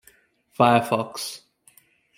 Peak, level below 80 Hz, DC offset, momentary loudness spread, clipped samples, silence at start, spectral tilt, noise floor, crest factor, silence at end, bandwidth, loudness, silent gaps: -2 dBFS; -68 dBFS; under 0.1%; 22 LU; under 0.1%; 0.6 s; -5 dB/octave; -58 dBFS; 22 dB; 0.8 s; 16.5 kHz; -22 LUFS; none